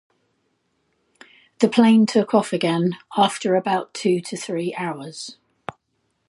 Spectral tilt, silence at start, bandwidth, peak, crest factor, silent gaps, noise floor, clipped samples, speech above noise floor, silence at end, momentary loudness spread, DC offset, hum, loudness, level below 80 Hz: -5.5 dB/octave; 1.6 s; 11.5 kHz; -2 dBFS; 20 dB; none; -71 dBFS; under 0.1%; 51 dB; 0.95 s; 21 LU; under 0.1%; none; -20 LUFS; -70 dBFS